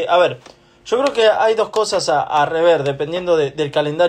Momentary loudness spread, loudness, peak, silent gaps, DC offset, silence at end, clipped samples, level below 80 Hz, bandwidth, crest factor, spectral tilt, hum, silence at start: 6 LU; -17 LUFS; -4 dBFS; none; under 0.1%; 0 s; under 0.1%; -56 dBFS; 10.5 kHz; 12 dB; -4 dB/octave; none; 0 s